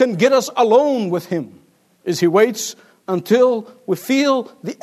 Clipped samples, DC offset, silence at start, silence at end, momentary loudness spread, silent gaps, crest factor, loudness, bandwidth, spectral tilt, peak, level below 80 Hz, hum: under 0.1%; under 0.1%; 0 s; 0.1 s; 13 LU; none; 16 dB; -17 LUFS; 13.5 kHz; -5 dB/octave; -2 dBFS; -72 dBFS; none